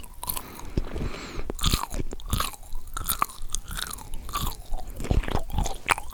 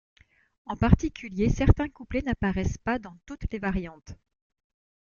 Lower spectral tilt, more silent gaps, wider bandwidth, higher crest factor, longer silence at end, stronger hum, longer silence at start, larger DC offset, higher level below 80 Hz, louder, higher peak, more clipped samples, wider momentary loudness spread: second, -3.5 dB/octave vs -7.5 dB/octave; neither; first, over 20 kHz vs 7.2 kHz; about the same, 26 dB vs 24 dB; second, 0 s vs 1 s; neither; second, 0 s vs 0.65 s; neither; about the same, -32 dBFS vs -34 dBFS; second, -31 LUFS vs -27 LUFS; about the same, -2 dBFS vs -4 dBFS; neither; second, 10 LU vs 17 LU